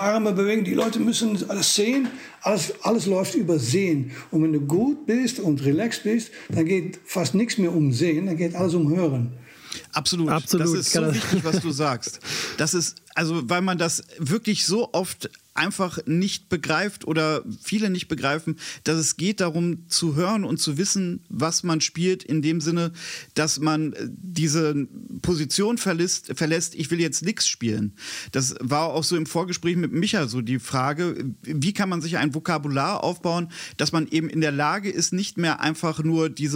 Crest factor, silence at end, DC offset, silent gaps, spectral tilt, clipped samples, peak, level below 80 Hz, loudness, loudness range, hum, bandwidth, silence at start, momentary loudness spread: 18 dB; 0 s; under 0.1%; none; -4.5 dB/octave; under 0.1%; -6 dBFS; -62 dBFS; -24 LUFS; 2 LU; none; 16 kHz; 0 s; 6 LU